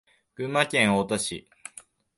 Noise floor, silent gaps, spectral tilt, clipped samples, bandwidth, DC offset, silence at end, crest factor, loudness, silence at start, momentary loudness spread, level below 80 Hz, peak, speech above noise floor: -52 dBFS; none; -3.5 dB/octave; under 0.1%; 11.5 kHz; under 0.1%; 0.8 s; 20 dB; -25 LUFS; 0.4 s; 22 LU; -60 dBFS; -8 dBFS; 27 dB